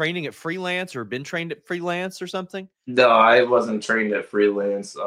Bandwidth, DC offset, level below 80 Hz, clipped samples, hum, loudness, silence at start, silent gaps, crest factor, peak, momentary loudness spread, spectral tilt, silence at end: 15 kHz; under 0.1%; -70 dBFS; under 0.1%; none; -21 LUFS; 0 s; none; 20 dB; -2 dBFS; 15 LU; -5 dB/octave; 0 s